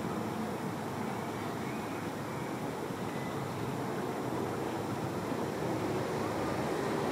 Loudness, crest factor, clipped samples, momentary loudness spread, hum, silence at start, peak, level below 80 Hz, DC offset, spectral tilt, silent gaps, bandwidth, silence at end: -36 LUFS; 14 dB; under 0.1%; 4 LU; none; 0 s; -22 dBFS; -64 dBFS; under 0.1%; -6 dB/octave; none; 16 kHz; 0 s